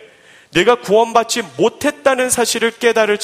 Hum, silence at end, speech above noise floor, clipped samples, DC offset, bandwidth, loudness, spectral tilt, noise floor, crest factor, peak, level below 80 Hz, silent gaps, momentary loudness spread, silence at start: none; 0 s; 30 dB; under 0.1%; under 0.1%; 16 kHz; -15 LUFS; -2.5 dB/octave; -45 dBFS; 16 dB; 0 dBFS; -54 dBFS; none; 4 LU; 0.55 s